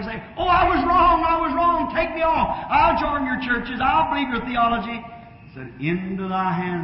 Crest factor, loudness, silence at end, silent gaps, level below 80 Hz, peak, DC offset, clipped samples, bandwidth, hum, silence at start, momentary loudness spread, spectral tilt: 14 dB; -20 LUFS; 0 s; none; -38 dBFS; -6 dBFS; under 0.1%; under 0.1%; 5.8 kHz; none; 0 s; 11 LU; -10.5 dB/octave